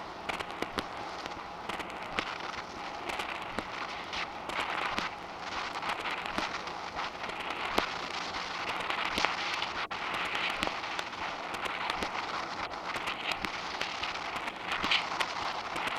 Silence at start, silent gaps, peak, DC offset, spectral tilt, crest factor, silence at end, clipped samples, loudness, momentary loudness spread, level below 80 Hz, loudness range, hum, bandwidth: 0 s; none; -6 dBFS; under 0.1%; -2.5 dB/octave; 30 dB; 0 s; under 0.1%; -34 LUFS; 7 LU; -58 dBFS; 4 LU; none; 16.5 kHz